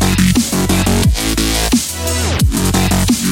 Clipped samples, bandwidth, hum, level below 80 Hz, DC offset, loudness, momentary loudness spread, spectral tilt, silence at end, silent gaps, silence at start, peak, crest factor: under 0.1%; 17 kHz; none; -22 dBFS; under 0.1%; -14 LUFS; 3 LU; -4 dB/octave; 0 s; none; 0 s; 0 dBFS; 12 dB